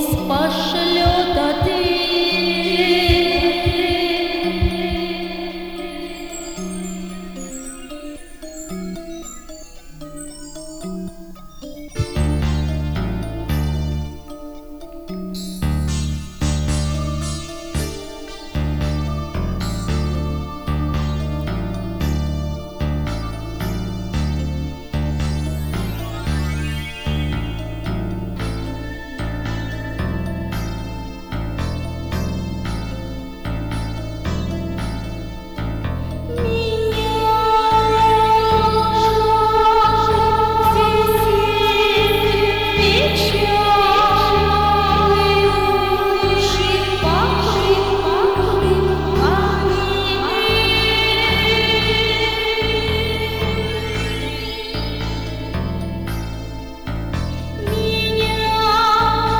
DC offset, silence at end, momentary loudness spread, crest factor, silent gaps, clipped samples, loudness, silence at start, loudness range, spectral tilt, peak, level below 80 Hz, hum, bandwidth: under 0.1%; 0 s; 16 LU; 16 dB; none; under 0.1%; -19 LUFS; 0 s; 12 LU; -5 dB/octave; -2 dBFS; -28 dBFS; none; over 20 kHz